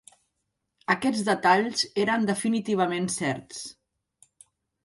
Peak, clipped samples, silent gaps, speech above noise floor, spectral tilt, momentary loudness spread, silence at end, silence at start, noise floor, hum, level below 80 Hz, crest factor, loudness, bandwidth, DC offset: -8 dBFS; under 0.1%; none; 54 dB; -4 dB/octave; 16 LU; 1.15 s; 0.9 s; -80 dBFS; none; -68 dBFS; 20 dB; -25 LUFS; 11.5 kHz; under 0.1%